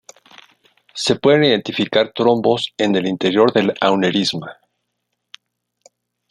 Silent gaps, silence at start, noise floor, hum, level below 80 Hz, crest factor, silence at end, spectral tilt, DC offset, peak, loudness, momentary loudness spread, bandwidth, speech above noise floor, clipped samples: none; 0.95 s; -75 dBFS; 60 Hz at -45 dBFS; -60 dBFS; 18 dB; 1.8 s; -5 dB/octave; under 0.1%; -2 dBFS; -16 LUFS; 8 LU; 11.5 kHz; 58 dB; under 0.1%